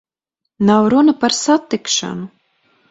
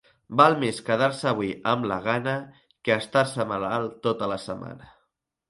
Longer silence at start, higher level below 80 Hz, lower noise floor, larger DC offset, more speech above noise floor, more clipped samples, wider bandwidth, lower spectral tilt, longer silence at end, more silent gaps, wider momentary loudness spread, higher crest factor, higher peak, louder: first, 0.6 s vs 0.3 s; about the same, -58 dBFS vs -62 dBFS; about the same, -78 dBFS vs -75 dBFS; neither; first, 63 dB vs 50 dB; neither; second, 8.4 kHz vs 11.5 kHz; second, -4 dB/octave vs -5.5 dB/octave; about the same, 0.65 s vs 0.65 s; neither; about the same, 15 LU vs 13 LU; second, 16 dB vs 24 dB; about the same, 0 dBFS vs -2 dBFS; first, -15 LUFS vs -25 LUFS